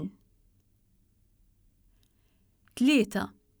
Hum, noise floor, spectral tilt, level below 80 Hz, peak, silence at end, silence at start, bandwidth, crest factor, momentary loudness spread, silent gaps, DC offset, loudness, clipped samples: none; -68 dBFS; -5 dB/octave; -64 dBFS; -14 dBFS; 0.3 s; 0 s; over 20 kHz; 20 dB; 18 LU; none; under 0.1%; -27 LUFS; under 0.1%